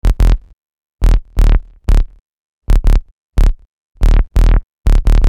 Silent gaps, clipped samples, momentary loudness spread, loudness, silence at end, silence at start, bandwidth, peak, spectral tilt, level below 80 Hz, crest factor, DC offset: 0.53-0.99 s, 2.20-2.62 s, 3.11-3.32 s, 3.67-3.95 s, 4.63-4.84 s; under 0.1%; 7 LU; -17 LUFS; 0 s; 0.05 s; 8 kHz; 0 dBFS; -7 dB/octave; -12 dBFS; 12 dB; under 0.1%